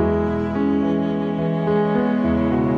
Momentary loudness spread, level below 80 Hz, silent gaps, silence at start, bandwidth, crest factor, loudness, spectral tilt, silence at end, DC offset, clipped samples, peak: 3 LU; -38 dBFS; none; 0 s; 6.4 kHz; 12 dB; -20 LUFS; -9.5 dB/octave; 0 s; under 0.1%; under 0.1%; -8 dBFS